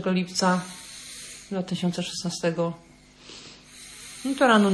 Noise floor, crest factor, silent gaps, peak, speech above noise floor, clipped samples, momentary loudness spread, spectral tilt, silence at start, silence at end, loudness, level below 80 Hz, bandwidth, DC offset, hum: -48 dBFS; 20 dB; none; -6 dBFS; 25 dB; under 0.1%; 20 LU; -4.5 dB/octave; 0 s; 0 s; -26 LUFS; -62 dBFS; 11 kHz; under 0.1%; 50 Hz at -60 dBFS